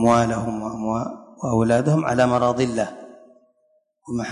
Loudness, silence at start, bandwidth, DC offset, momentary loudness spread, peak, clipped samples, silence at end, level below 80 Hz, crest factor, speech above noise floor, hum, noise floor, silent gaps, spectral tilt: -22 LUFS; 0 s; 11 kHz; under 0.1%; 12 LU; -4 dBFS; under 0.1%; 0 s; -50 dBFS; 18 dB; 45 dB; none; -65 dBFS; none; -6.5 dB/octave